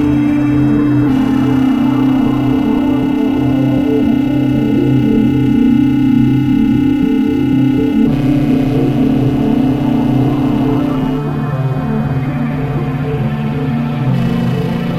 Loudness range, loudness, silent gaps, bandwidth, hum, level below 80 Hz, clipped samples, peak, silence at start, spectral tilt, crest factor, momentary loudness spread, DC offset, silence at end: 4 LU; -13 LUFS; none; 13 kHz; none; -32 dBFS; under 0.1%; 0 dBFS; 0 s; -9 dB/octave; 12 dB; 5 LU; under 0.1%; 0 s